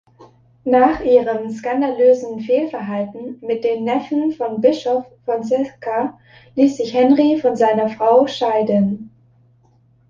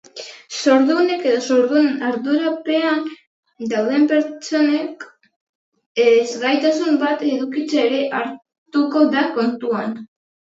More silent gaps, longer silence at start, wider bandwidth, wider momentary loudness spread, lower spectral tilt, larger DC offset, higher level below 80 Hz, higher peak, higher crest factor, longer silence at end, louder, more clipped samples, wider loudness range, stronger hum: second, none vs 3.27-3.43 s, 5.36-5.72 s, 5.86-5.95 s, 8.58-8.66 s; about the same, 0.2 s vs 0.15 s; about the same, 7.4 kHz vs 8 kHz; second, 10 LU vs 14 LU; first, -7 dB/octave vs -4 dB/octave; neither; first, -54 dBFS vs -76 dBFS; about the same, -2 dBFS vs -2 dBFS; about the same, 16 dB vs 18 dB; first, 1 s vs 0.35 s; about the same, -17 LUFS vs -18 LUFS; neither; about the same, 4 LU vs 2 LU; neither